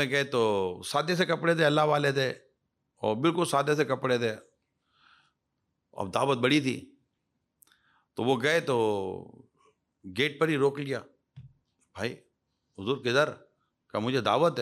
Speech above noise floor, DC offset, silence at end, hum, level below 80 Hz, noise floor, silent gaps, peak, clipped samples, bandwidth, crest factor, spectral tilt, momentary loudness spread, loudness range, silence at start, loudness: 53 dB; under 0.1%; 0 s; none; -74 dBFS; -80 dBFS; none; -12 dBFS; under 0.1%; 15.5 kHz; 18 dB; -5 dB/octave; 13 LU; 5 LU; 0 s; -28 LUFS